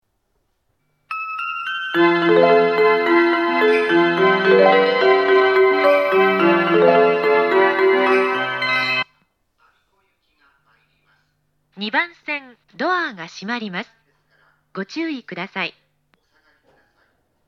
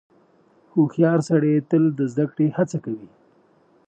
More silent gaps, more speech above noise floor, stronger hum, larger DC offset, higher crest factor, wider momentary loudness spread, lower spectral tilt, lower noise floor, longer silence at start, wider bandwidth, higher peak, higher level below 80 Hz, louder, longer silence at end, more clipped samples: neither; first, 50 dB vs 38 dB; neither; neither; about the same, 18 dB vs 18 dB; first, 14 LU vs 10 LU; second, -6 dB/octave vs -8.5 dB/octave; first, -69 dBFS vs -58 dBFS; first, 1.1 s vs 0.75 s; first, 13 kHz vs 8.8 kHz; first, 0 dBFS vs -4 dBFS; about the same, -74 dBFS vs -72 dBFS; first, -17 LUFS vs -21 LUFS; first, 1.8 s vs 0.8 s; neither